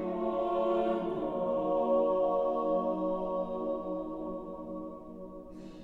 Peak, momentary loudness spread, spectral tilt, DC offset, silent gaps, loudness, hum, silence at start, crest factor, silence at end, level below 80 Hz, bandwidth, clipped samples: -18 dBFS; 17 LU; -9 dB/octave; under 0.1%; none; -32 LUFS; none; 0 s; 14 dB; 0 s; -58 dBFS; 4.4 kHz; under 0.1%